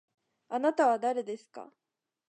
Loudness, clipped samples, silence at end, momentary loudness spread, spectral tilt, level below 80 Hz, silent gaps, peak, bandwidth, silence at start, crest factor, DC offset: -29 LUFS; under 0.1%; 0.65 s; 21 LU; -4.5 dB/octave; under -90 dBFS; none; -14 dBFS; 9.2 kHz; 0.5 s; 18 dB; under 0.1%